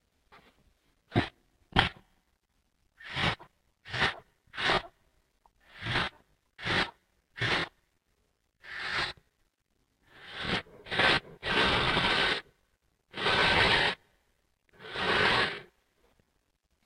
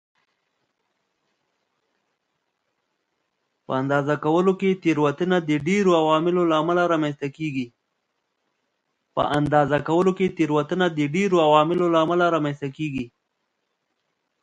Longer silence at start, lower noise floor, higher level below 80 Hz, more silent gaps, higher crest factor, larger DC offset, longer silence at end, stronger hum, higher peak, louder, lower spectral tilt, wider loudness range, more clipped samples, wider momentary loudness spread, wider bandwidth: second, 1.1 s vs 3.7 s; about the same, -76 dBFS vs -76 dBFS; first, -52 dBFS vs -60 dBFS; neither; first, 28 dB vs 22 dB; neither; second, 1.2 s vs 1.35 s; neither; second, -6 dBFS vs -2 dBFS; second, -29 LUFS vs -21 LUFS; second, -4 dB/octave vs -6.5 dB/octave; first, 8 LU vs 5 LU; neither; first, 17 LU vs 11 LU; first, 16 kHz vs 9.2 kHz